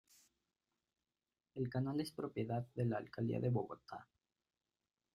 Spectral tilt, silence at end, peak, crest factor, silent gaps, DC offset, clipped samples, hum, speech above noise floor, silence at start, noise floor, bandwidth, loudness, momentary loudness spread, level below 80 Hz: -8 dB/octave; 1.1 s; -26 dBFS; 18 dB; none; under 0.1%; under 0.1%; none; over 49 dB; 1.55 s; under -90 dBFS; 13 kHz; -41 LUFS; 14 LU; -76 dBFS